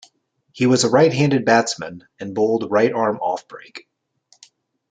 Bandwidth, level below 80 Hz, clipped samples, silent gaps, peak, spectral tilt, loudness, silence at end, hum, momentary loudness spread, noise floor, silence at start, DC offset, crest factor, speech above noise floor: 9.6 kHz; -62 dBFS; under 0.1%; none; -2 dBFS; -5 dB/octave; -18 LUFS; 1.15 s; none; 19 LU; -62 dBFS; 0.55 s; under 0.1%; 18 dB; 43 dB